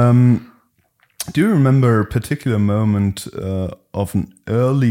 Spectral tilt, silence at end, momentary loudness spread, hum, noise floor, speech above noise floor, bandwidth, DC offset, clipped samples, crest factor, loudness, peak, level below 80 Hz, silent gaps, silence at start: -7.5 dB/octave; 0 s; 11 LU; none; -61 dBFS; 45 dB; 16 kHz; under 0.1%; under 0.1%; 12 dB; -18 LUFS; -4 dBFS; -46 dBFS; none; 0 s